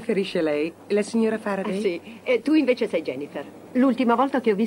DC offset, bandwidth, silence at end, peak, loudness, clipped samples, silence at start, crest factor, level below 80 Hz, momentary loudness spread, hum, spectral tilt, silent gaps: under 0.1%; 16 kHz; 0 s; -8 dBFS; -23 LUFS; under 0.1%; 0 s; 16 dB; -76 dBFS; 10 LU; none; -6 dB/octave; none